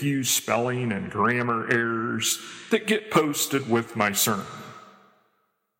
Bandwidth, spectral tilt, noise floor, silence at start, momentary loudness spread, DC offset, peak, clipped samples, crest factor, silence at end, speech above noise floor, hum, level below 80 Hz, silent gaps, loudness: 16.5 kHz; -3.5 dB/octave; -72 dBFS; 0 s; 7 LU; under 0.1%; -6 dBFS; under 0.1%; 20 dB; 0.9 s; 47 dB; none; -68 dBFS; none; -24 LUFS